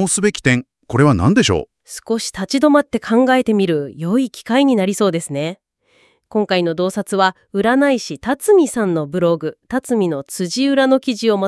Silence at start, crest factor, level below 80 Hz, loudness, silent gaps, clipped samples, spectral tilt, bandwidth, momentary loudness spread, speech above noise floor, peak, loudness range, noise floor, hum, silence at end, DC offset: 0 s; 16 dB; -50 dBFS; -17 LUFS; none; under 0.1%; -5 dB/octave; 12 kHz; 9 LU; 41 dB; 0 dBFS; 3 LU; -57 dBFS; none; 0 s; under 0.1%